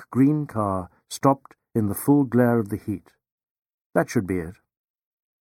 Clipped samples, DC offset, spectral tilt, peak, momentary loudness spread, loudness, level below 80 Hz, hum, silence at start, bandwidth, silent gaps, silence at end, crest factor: under 0.1%; under 0.1%; -7 dB/octave; -4 dBFS; 12 LU; -23 LUFS; -58 dBFS; none; 0 s; 17 kHz; 3.32-3.38 s, 3.50-3.62 s, 3.74-3.90 s; 0.9 s; 20 dB